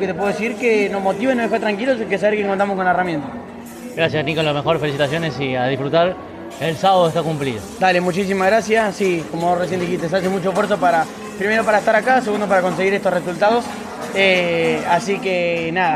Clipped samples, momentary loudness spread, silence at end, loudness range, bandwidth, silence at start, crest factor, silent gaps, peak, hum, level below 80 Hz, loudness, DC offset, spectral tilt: under 0.1%; 8 LU; 0 s; 3 LU; 14.5 kHz; 0 s; 16 dB; none; -2 dBFS; none; -54 dBFS; -18 LUFS; under 0.1%; -5 dB/octave